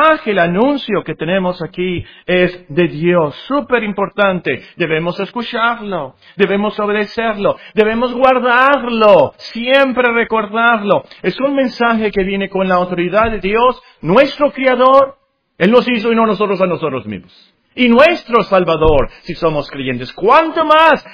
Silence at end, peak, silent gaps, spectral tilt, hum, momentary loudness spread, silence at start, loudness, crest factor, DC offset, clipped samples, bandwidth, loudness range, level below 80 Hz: 0 s; 0 dBFS; none; -7.5 dB/octave; none; 11 LU; 0 s; -14 LUFS; 14 dB; under 0.1%; 0.3%; 5.4 kHz; 4 LU; -36 dBFS